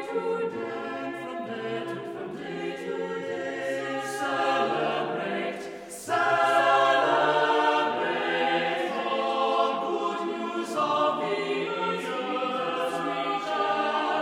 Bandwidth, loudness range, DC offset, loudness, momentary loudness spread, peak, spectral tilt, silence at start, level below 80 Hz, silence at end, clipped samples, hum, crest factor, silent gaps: 16 kHz; 9 LU; under 0.1%; -27 LUFS; 12 LU; -8 dBFS; -4 dB/octave; 0 s; -72 dBFS; 0 s; under 0.1%; none; 18 dB; none